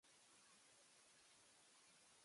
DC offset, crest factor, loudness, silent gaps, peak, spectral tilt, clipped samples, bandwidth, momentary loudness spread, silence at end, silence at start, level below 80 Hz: under 0.1%; 14 dB; -69 LUFS; none; -58 dBFS; -0.5 dB/octave; under 0.1%; 11.5 kHz; 0 LU; 0 s; 0 s; under -90 dBFS